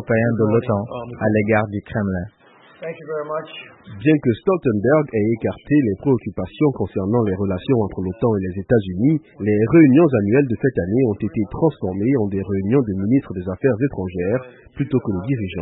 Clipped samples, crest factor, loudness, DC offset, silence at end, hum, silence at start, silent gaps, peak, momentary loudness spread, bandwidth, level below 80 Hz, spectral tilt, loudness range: under 0.1%; 16 dB; -19 LUFS; under 0.1%; 0 s; none; 0 s; none; -2 dBFS; 11 LU; 4 kHz; -48 dBFS; -13.5 dB/octave; 5 LU